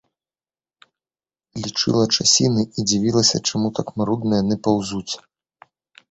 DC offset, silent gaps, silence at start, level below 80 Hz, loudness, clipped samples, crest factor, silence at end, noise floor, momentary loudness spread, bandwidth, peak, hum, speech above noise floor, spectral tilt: under 0.1%; none; 1.55 s; -54 dBFS; -19 LUFS; under 0.1%; 20 dB; 0.95 s; under -90 dBFS; 13 LU; 8.2 kHz; -2 dBFS; none; over 70 dB; -4 dB/octave